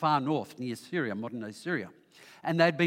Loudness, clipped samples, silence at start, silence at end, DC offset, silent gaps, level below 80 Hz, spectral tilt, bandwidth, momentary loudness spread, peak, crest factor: -32 LUFS; under 0.1%; 0 s; 0 s; under 0.1%; none; -82 dBFS; -6 dB/octave; 16 kHz; 12 LU; -10 dBFS; 22 dB